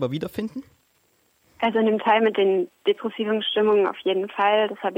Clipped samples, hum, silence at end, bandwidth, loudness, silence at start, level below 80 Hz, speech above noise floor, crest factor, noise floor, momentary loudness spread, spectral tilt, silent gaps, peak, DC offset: under 0.1%; none; 0 s; 16 kHz; -22 LUFS; 0 s; -66 dBFS; 43 dB; 16 dB; -65 dBFS; 10 LU; -6.5 dB/octave; none; -6 dBFS; under 0.1%